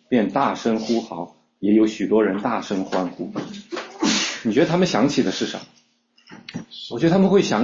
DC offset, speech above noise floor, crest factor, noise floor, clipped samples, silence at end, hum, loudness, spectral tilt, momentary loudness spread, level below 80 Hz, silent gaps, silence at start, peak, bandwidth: under 0.1%; 39 dB; 16 dB; -60 dBFS; under 0.1%; 0 s; none; -21 LUFS; -5 dB/octave; 16 LU; -60 dBFS; none; 0.1 s; -4 dBFS; 7.6 kHz